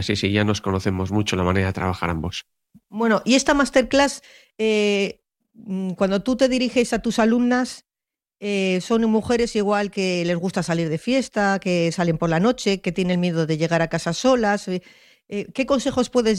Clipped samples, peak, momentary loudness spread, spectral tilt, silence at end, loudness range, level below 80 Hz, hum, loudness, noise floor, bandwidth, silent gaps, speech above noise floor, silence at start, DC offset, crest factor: under 0.1%; -4 dBFS; 10 LU; -5 dB/octave; 0 s; 2 LU; -48 dBFS; none; -21 LUFS; -89 dBFS; 13 kHz; none; 68 dB; 0 s; under 0.1%; 16 dB